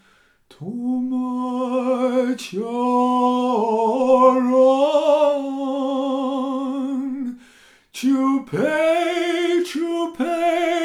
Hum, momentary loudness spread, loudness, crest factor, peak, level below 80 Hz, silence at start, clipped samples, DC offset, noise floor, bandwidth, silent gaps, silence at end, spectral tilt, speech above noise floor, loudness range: none; 10 LU; -20 LUFS; 16 dB; -2 dBFS; -68 dBFS; 0.6 s; under 0.1%; under 0.1%; -57 dBFS; 13.5 kHz; none; 0 s; -5 dB/octave; 34 dB; 6 LU